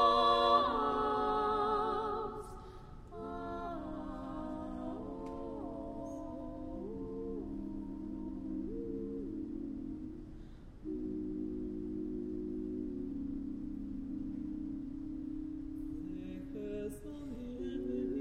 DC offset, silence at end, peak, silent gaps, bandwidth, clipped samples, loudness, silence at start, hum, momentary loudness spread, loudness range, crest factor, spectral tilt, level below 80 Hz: under 0.1%; 0 s; -16 dBFS; none; 13 kHz; under 0.1%; -39 LUFS; 0 s; none; 12 LU; 7 LU; 22 dB; -6.5 dB/octave; -52 dBFS